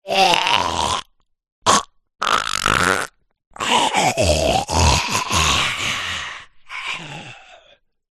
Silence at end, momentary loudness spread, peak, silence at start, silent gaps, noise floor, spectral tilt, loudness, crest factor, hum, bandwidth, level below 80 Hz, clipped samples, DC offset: 0.6 s; 14 LU; 0 dBFS; 0.05 s; 1.52-1.62 s, 3.47-3.51 s; -55 dBFS; -2.5 dB/octave; -18 LUFS; 20 dB; none; 13 kHz; -36 dBFS; under 0.1%; under 0.1%